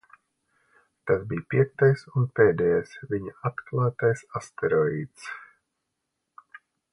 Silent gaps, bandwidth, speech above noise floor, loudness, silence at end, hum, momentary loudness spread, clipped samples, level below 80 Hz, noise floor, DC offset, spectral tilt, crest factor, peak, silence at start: none; 11 kHz; 56 dB; -25 LUFS; 1.5 s; none; 16 LU; under 0.1%; -58 dBFS; -81 dBFS; under 0.1%; -8 dB/octave; 20 dB; -6 dBFS; 1.05 s